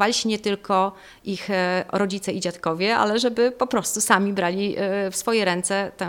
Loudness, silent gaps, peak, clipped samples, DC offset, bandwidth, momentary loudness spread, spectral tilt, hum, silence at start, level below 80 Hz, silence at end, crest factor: -22 LUFS; none; 0 dBFS; under 0.1%; under 0.1%; 18.5 kHz; 7 LU; -3.5 dB/octave; none; 0 s; -60 dBFS; 0 s; 22 dB